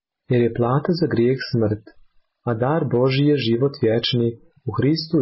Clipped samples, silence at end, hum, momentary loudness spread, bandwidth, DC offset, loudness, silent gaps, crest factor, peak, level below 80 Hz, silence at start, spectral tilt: under 0.1%; 0 s; none; 8 LU; 5.8 kHz; under 0.1%; -20 LUFS; none; 12 dB; -8 dBFS; -52 dBFS; 0.3 s; -11 dB/octave